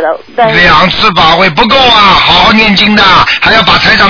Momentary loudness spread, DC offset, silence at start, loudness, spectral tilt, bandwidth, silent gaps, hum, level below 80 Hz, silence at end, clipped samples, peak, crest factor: 3 LU; under 0.1%; 0 s; -4 LUFS; -4.5 dB/octave; 5.4 kHz; none; none; -26 dBFS; 0 s; 10%; 0 dBFS; 4 dB